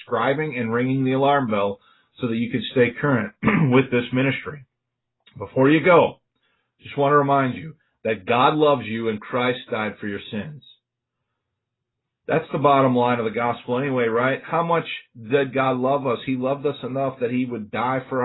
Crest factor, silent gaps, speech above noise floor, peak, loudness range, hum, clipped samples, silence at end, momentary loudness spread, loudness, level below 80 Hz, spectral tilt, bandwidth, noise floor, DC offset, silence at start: 18 dB; none; 60 dB; -4 dBFS; 4 LU; none; under 0.1%; 0 s; 13 LU; -21 LUFS; -58 dBFS; -11.5 dB/octave; 4.1 kHz; -81 dBFS; under 0.1%; 0 s